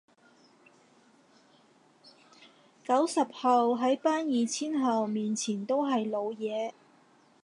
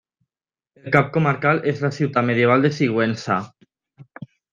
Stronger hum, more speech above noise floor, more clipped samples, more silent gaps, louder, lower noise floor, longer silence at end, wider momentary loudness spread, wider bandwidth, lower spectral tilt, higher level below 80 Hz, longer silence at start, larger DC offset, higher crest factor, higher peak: neither; second, 34 dB vs over 71 dB; neither; neither; second, -29 LUFS vs -19 LUFS; second, -62 dBFS vs under -90 dBFS; first, 0.75 s vs 0.25 s; second, 8 LU vs 21 LU; first, 11.5 kHz vs 7.6 kHz; second, -4.5 dB/octave vs -7 dB/octave; second, -86 dBFS vs -62 dBFS; first, 2.9 s vs 0.85 s; neither; about the same, 18 dB vs 20 dB; second, -14 dBFS vs -2 dBFS